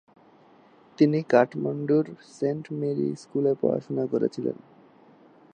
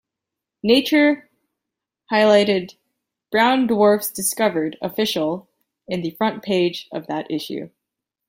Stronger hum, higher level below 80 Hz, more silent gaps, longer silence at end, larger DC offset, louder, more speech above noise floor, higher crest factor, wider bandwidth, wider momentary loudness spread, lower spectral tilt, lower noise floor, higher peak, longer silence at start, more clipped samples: neither; second, -76 dBFS vs -64 dBFS; neither; first, 1 s vs 0.6 s; neither; second, -26 LUFS vs -19 LUFS; second, 31 dB vs 66 dB; about the same, 22 dB vs 18 dB; second, 9.4 kHz vs 16.5 kHz; second, 9 LU vs 14 LU; first, -8 dB/octave vs -4 dB/octave; second, -56 dBFS vs -84 dBFS; about the same, -4 dBFS vs -2 dBFS; first, 1 s vs 0.65 s; neither